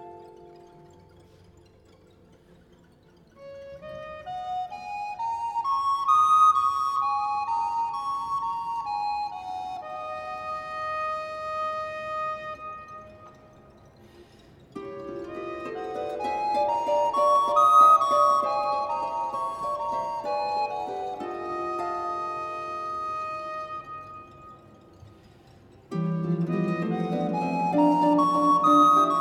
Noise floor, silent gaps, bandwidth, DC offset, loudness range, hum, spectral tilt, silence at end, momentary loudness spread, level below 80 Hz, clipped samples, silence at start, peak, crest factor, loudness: -57 dBFS; none; 17 kHz; under 0.1%; 16 LU; none; -6 dB/octave; 0 s; 19 LU; -62 dBFS; under 0.1%; 0 s; -8 dBFS; 20 dB; -25 LUFS